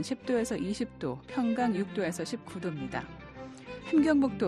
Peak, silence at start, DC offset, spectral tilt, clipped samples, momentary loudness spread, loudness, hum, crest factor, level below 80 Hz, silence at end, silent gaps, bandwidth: -14 dBFS; 0 s; under 0.1%; -6 dB/octave; under 0.1%; 18 LU; -31 LUFS; none; 18 dB; -58 dBFS; 0 s; none; 12.5 kHz